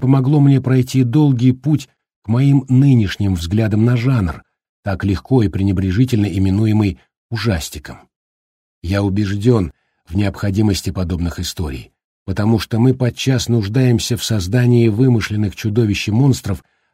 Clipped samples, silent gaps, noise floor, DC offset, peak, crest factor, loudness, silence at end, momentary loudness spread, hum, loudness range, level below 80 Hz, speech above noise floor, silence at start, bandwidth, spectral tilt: under 0.1%; 2.16-2.22 s, 4.69-4.83 s, 7.17-7.29 s, 8.16-8.82 s, 12.04-12.26 s; under -90 dBFS; under 0.1%; -2 dBFS; 14 dB; -16 LUFS; 0.35 s; 13 LU; none; 5 LU; -38 dBFS; over 75 dB; 0 s; 15.5 kHz; -7 dB/octave